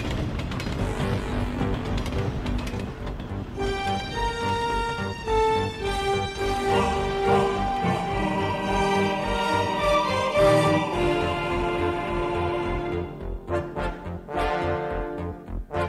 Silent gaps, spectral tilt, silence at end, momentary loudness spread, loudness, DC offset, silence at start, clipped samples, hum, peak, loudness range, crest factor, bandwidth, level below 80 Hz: none; -6 dB/octave; 0 s; 10 LU; -26 LUFS; under 0.1%; 0 s; under 0.1%; none; -8 dBFS; 6 LU; 16 dB; 15 kHz; -36 dBFS